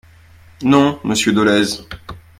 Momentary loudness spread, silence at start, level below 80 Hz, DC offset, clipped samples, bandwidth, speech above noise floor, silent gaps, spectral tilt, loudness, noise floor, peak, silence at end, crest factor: 16 LU; 0.6 s; -48 dBFS; under 0.1%; under 0.1%; 15.5 kHz; 30 dB; none; -4.5 dB/octave; -15 LUFS; -45 dBFS; 0 dBFS; 0.2 s; 18 dB